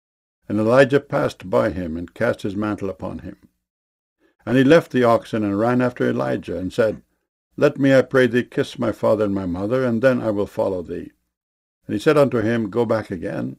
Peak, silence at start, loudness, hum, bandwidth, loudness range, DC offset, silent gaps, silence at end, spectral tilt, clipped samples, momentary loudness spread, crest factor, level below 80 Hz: -2 dBFS; 0.5 s; -20 LUFS; none; 15 kHz; 3 LU; under 0.1%; 3.70-4.16 s, 7.29-7.51 s, 11.37-11.81 s; 0.05 s; -7 dB/octave; under 0.1%; 13 LU; 18 dB; -52 dBFS